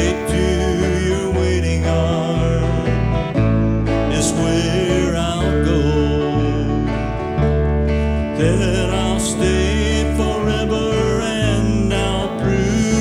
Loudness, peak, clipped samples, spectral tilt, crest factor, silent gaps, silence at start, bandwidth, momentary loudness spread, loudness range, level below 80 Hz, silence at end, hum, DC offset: -18 LUFS; -4 dBFS; under 0.1%; -6 dB/octave; 14 dB; none; 0 s; 13 kHz; 2 LU; 1 LU; -24 dBFS; 0 s; none; under 0.1%